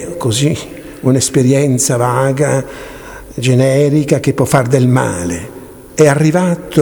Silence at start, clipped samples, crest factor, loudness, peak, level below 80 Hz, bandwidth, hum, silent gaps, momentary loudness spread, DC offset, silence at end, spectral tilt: 0 s; 0.1%; 12 dB; -13 LUFS; 0 dBFS; -42 dBFS; over 20 kHz; none; none; 17 LU; under 0.1%; 0 s; -5.5 dB/octave